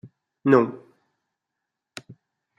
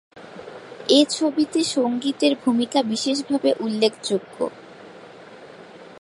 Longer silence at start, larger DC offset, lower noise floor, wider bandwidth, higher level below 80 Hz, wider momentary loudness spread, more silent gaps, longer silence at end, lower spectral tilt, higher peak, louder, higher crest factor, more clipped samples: about the same, 0.05 s vs 0.15 s; neither; first, -84 dBFS vs -43 dBFS; second, 10 kHz vs 11.5 kHz; about the same, -72 dBFS vs -70 dBFS; about the same, 24 LU vs 24 LU; neither; first, 1.8 s vs 0 s; first, -7.5 dB/octave vs -3.5 dB/octave; about the same, -2 dBFS vs -4 dBFS; about the same, -21 LUFS vs -21 LUFS; about the same, 24 dB vs 20 dB; neither